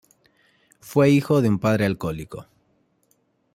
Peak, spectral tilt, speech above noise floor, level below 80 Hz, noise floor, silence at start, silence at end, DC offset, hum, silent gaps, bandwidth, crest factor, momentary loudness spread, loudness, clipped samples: -6 dBFS; -7.5 dB/octave; 46 dB; -54 dBFS; -66 dBFS; 0.85 s; 1.15 s; under 0.1%; none; none; 16 kHz; 18 dB; 18 LU; -21 LUFS; under 0.1%